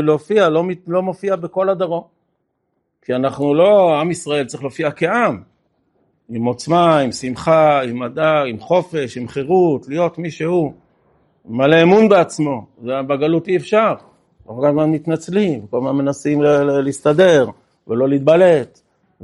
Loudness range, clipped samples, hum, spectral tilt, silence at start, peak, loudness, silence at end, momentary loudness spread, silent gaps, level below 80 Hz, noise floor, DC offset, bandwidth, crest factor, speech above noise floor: 3 LU; under 0.1%; none; -6.5 dB/octave; 0 s; 0 dBFS; -16 LUFS; 0.6 s; 12 LU; none; -58 dBFS; -70 dBFS; under 0.1%; 11.5 kHz; 16 dB; 54 dB